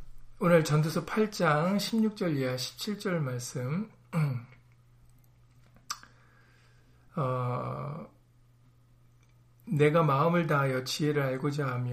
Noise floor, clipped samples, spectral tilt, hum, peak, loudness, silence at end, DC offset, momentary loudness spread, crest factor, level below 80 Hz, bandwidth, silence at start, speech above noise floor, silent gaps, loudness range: -61 dBFS; under 0.1%; -6 dB/octave; none; -12 dBFS; -29 LUFS; 0 s; under 0.1%; 14 LU; 20 dB; -60 dBFS; 15.5 kHz; 0 s; 33 dB; none; 10 LU